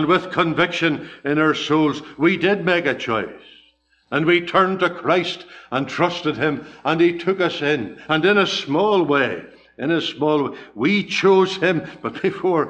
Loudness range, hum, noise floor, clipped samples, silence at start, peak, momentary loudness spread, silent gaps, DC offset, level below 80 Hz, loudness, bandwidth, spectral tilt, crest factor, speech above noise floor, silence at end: 2 LU; none; -59 dBFS; under 0.1%; 0 s; -2 dBFS; 9 LU; none; under 0.1%; -58 dBFS; -19 LUFS; 8.6 kHz; -5.5 dB/octave; 18 dB; 40 dB; 0 s